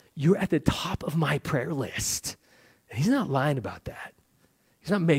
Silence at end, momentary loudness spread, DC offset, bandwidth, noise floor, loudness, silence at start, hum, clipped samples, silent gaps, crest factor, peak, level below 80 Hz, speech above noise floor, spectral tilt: 0 s; 16 LU; under 0.1%; 16 kHz; -66 dBFS; -27 LUFS; 0.15 s; none; under 0.1%; none; 22 dB; -6 dBFS; -52 dBFS; 39 dB; -5.5 dB/octave